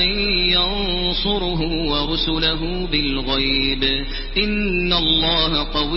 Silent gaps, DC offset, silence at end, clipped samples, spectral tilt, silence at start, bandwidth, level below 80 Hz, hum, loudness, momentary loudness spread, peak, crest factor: none; under 0.1%; 0 s; under 0.1%; -9 dB/octave; 0 s; 5.8 kHz; -28 dBFS; none; -18 LUFS; 6 LU; -6 dBFS; 14 dB